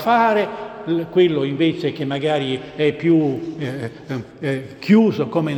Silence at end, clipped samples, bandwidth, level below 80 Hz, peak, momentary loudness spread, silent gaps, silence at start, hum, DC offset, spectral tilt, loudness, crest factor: 0 s; under 0.1%; 18.5 kHz; -58 dBFS; -2 dBFS; 12 LU; none; 0 s; none; under 0.1%; -7.5 dB/octave; -19 LUFS; 16 dB